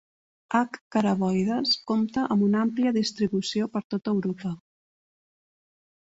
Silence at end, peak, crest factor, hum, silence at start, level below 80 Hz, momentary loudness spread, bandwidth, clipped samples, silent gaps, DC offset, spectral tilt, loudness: 1.45 s; -10 dBFS; 18 dB; none; 0.5 s; -64 dBFS; 6 LU; 8 kHz; under 0.1%; 0.81-0.91 s, 3.84-3.90 s; under 0.1%; -6 dB/octave; -26 LUFS